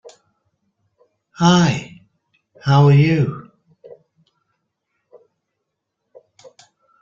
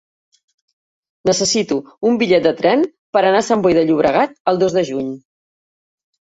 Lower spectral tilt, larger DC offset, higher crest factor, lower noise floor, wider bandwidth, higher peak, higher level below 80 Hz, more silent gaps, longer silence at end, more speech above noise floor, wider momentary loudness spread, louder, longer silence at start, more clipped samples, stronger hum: first, -6.5 dB/octave vs -4 dB/octave; neither; about the same, 18 dB vs 16 dB; second, -77 dBFS vs under -90 dBFS; second, 7.4 kHz vs 8.2 kHz; about the same, -2 dBFS vs -2 dBFS; about the same, -54 dBFS vs -54 dBFS; second, none vs 2.99-3.13 s, 4.40-4.45 s; first, 3.6 s vs 1 s; second, 64 dB vs over 75 dB; first, 17 LU vs 8 LU; about the same, -15 LUFS vs -16 LUFS; first, 1.4 s vs 1.25 s; neither; neither